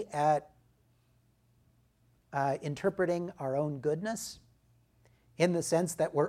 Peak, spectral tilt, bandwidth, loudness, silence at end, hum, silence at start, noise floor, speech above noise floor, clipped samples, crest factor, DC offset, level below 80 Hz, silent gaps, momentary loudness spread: -12 dBFS; -5.5 dB/octave; 16 kHz; -32 LUFS; 0 s; none; 0 s; -69 dBFS; 38 dB; under 0.1%; 22 dB; under 0.1%; -70 dBFS; none; 9 LU